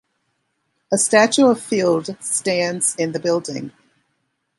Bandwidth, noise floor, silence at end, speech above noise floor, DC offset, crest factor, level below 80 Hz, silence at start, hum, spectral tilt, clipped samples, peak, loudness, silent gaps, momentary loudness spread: 11.5 kHz; -71 dBFS; 0.9 s; 53 dB; under 0.1%; 18 dB; -68 dBFS; 0.9 s; none; -3.5 dB/octave; under 0.1%; -2 dBFS; -18 LUFS; none; 9 LU